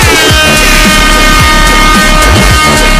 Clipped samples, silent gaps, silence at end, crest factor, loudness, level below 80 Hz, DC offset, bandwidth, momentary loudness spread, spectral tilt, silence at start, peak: 1%; none; 0 s; 4 dB; -4 LUFS; -10 dBFS; under 0.1%; 16 kHz; 1 LU; -3 dB/octave; 0 s; 0 dBFS